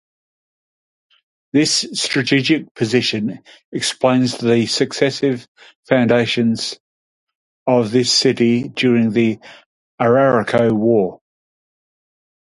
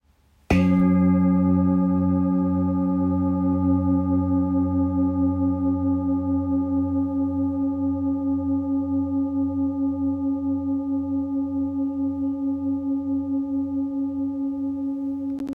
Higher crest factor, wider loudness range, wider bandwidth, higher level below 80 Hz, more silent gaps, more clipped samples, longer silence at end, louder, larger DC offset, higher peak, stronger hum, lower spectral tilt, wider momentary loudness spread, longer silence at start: about the same, 18 dB vs 16 dB; about the same, 3 LU vs 5 LU; first, 11.5 kHz vs 5.6 kHz; second, -58 dBFS vs -50 dBFS; first, 2.71-2.75 s, 3.65-3.72 s, 5.48-5.55 s, 5.75-5.83 s, 6.80-7.27 s, 7.35-7.66 s, 9.66-9.98 s vs none; neither; first, 1.4 s vs 0 s; first, -16 LUFS vs -23 LUFS; neither; first, 0 dBFS vs -6 dBFS; neither; second, -4.5 dB/octave vs -10 dB/octave; first, 10 LU vs 7 LU; first, 1.55 s vs 0.5 s